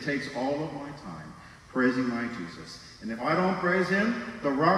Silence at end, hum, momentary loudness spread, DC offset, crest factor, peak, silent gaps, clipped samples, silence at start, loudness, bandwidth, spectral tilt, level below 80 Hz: 0 s; none; 17 LU; under 0.1%; 18 dB; -10 dBFS; none; under 0.1%; 0 s; -28 LUFS; 12 kHz; -6.5 dB/octave; -60 dBFS